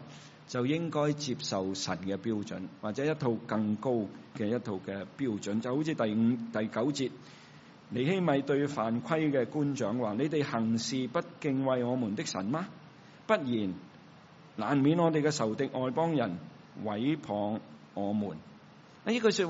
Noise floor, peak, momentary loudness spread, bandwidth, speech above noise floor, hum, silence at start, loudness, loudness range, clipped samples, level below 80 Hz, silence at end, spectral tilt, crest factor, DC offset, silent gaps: -55 dBFS; -12 dBFS; 12 LU; 7.6 kHz; 24 dB; none; 0 s; -32 LUFS; 3 LU; under 0.1%; -74 dBFS; 0 s; -5.5 dB/octave; 18 dB; under 0.1%; none